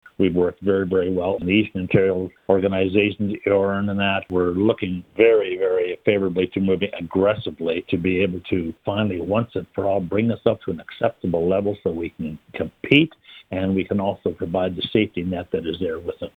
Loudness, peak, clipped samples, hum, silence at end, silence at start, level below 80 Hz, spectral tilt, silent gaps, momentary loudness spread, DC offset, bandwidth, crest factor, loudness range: -22 LUFS; -2 dBFS; under 0.1%; none; 0.1 s; 0.2 s; -52 dBFS; -8.5 dB/octave; none; 8 LU; under 0.1%; 4.6 kHz; 20 dB; 3 LU